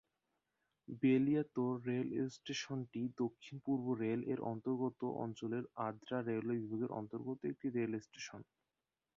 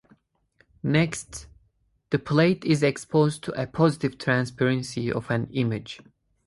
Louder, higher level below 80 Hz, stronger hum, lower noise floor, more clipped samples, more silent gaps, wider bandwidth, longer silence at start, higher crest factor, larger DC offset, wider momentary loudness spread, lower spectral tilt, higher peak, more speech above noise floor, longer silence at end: second, -40 LUFS vs -25 LUFS; second, -80 dBFS vs -56 dBFS; neither; first, under -90 dBFS vs -67 dBFS; neither; neither; second, 7.4 kHz vs 11.5 kHz; about the same, 0.9 s vs 0.85 s; about the same, 18 dB vs 18 dB; neither; second, 9 LU vs 12 LU; about the same, -6.5 dB/octave vs -6 dB/octave; second, -22 dBFS vs -6 dBFS; first, over 51 dB vs 43 dB; first, 0.75 s vs 0.5 s